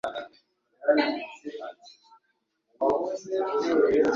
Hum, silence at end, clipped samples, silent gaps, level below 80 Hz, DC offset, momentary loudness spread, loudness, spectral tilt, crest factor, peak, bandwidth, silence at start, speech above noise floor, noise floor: none; 0 s; under 0.1%; none; -66 dBFS; under 0.1%; 17 LU; -26 LUFS; -4.5 dB/octave; 18 dB; -10 dBFS; 7.6 kHz; 0.05 s; 52 dB; -75 dBFS